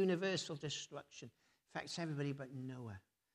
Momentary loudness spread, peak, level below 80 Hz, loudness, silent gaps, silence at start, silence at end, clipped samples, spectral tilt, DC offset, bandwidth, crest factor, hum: 17 LU; -26 dBFS; -82 dBFS; -44 LUFS; none; 0 s; 0.35 s; under 0.1%; -5 dB/octave; under 0.1%; 13 kHz; 16 dB; none